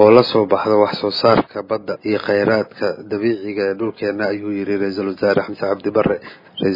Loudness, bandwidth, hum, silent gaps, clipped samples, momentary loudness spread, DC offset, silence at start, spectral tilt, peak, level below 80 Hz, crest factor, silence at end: -18 LUFS; 5.4 kHz; none; none; under 0.1%; 8 LU; under 0.1%; 0 s; -7.5 dB/octave; 0 dBFS; -54 dBFS; 18 dB; 0 s